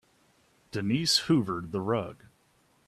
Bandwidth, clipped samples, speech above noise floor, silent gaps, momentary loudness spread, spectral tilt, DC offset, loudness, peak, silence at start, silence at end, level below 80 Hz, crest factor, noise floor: 14.5 kHz; under 0.1%; 39 dB; none; 12 LU; -4.5 dB/octave; under 0.1%; -28 LUFS; -10 dBFS; 0.75 s; 0.75 s; -64 dBFS; 20 dB; -67 dBFS